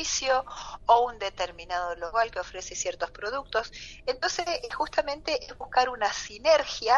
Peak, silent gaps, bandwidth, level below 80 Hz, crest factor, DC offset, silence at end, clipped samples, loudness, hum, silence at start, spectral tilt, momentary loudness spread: -8 dBFS; none; 8 kHz; -52 dBFS; 20 dB; under 0.1%; 0 s; under 0.1%; -28 LUFS; none; 0 s; -1 dB/octave; 10 LU